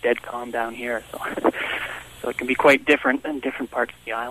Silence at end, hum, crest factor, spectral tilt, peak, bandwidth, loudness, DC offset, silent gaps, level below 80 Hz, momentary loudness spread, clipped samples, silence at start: 0 s; none; 20 dB; -4 dB/octave; -4 dBFS; 14 kHz; -23 LUFS; under 0.1%; none; -56 dBFS; 13 LU; under 0.1%; 0.05 s